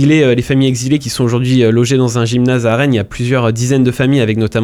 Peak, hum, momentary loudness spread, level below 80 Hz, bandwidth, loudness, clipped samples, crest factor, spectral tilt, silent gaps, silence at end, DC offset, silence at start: 0 dBFS; none; 4 LU; -40 dBFS; 14 kHz; -12 LUFS; under 0.1%; 10 dB; -6 dB/octave; none; 0 s; under 0.1%; 0 s